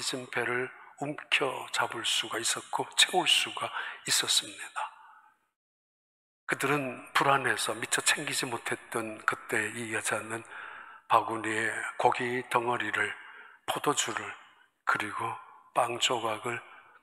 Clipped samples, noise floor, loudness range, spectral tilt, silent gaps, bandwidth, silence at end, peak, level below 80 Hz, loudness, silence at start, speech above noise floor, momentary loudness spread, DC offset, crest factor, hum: under 0.1%; -59 dBFS; 5 LU; -1.5 dB/octave; 5.56-6.47 s; 16 kHz; 0.2 s; -8 dBFS; -80 dBFS; -29 LUFS; 0 s; 29 dB; 14 LU; under 0.1%; 24 dB; none